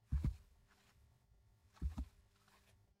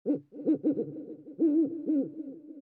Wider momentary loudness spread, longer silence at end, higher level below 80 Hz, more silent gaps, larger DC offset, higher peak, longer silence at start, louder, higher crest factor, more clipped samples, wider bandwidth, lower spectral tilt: second, 13 LU vs 17 LU; first, 0.95 s vs 0 s; first, -48 dBFS vs -88 dBFS; neither; neither; second, -28 dBFS vs -18 dBFS; about the same, 0.1 s vs 0.05 s; second, -47 LUFS vs -30 LUFS; first, 20 dB vs 14 dB; neither; first, 10.5 kHz vs 2.1 kHz; second, -8 dB/octave vs -12 dB/octave